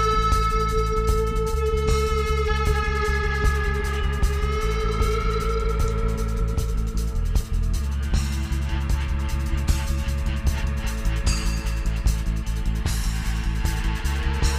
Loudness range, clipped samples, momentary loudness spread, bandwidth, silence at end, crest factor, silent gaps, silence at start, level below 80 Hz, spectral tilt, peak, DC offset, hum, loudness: 3 LU; under 0.1%; 5 LU; 15.5 kHz; 0 s; 16 dB; none; 0 s; -24 dBFS; -5.5 dB/octave; -6 dBFS; under 0.1%; none; -25 LUFS